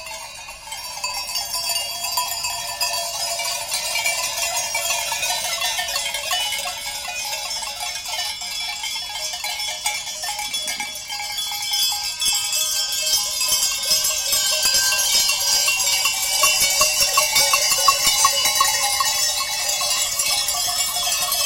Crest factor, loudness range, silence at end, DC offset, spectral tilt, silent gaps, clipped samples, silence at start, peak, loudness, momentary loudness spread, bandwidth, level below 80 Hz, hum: 20 dB; 9 LU; 0 s; under 0.1%; 2 dB/octave; none; under 0.1%; 0 s; 0 dBFS; -19 LUFS; 10 LU; 17 kHz; -52 dBFS; none